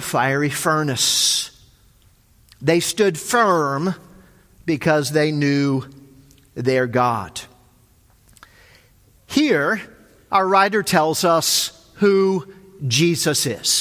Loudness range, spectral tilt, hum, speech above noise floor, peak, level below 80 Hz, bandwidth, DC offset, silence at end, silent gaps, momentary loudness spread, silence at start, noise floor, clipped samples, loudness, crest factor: 6 LU; -3.5 dB/octave; none; 36 dB; 0 dBFS; -56 dBFS; 16 kHz; under 0.1%; 0 s; none; 10 LU; 0 s; -55 dBFS; under 0.1%; -18 LUFS; 20 dB